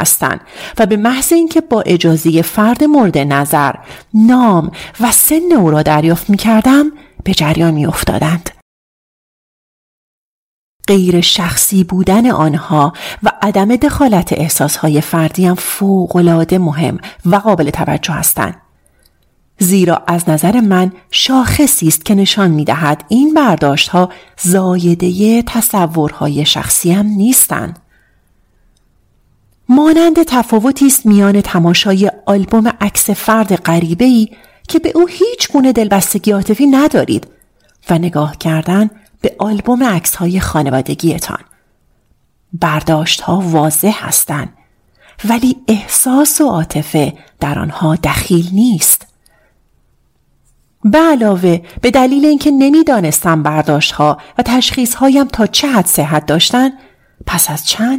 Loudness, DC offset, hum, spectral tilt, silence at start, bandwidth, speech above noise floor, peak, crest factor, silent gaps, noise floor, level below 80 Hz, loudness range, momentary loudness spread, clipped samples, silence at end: -11 LUFS; under 0.1%; none; -4.5 dB/octave; 0 s; 16.5 kHz; 46 dB; 0 dBFS; 12 dB; 8.62-10.80 s; -56 dBFS; -38 dBFS; 4 LU; 7 LU; under 0.1%; 0 s